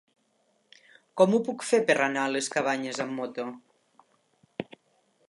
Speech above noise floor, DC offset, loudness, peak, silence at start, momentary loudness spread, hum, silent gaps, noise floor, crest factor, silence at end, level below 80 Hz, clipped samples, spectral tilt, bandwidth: 44 dB; under 0.1%; -27 LUFS; -8 dBFS; 1.15 s; 18 LU; none; none; -70 dBFS; 22 dB; 0.65 s; -80 dBFS; under 0.1%; -4 dB/octave; 11.5 kHz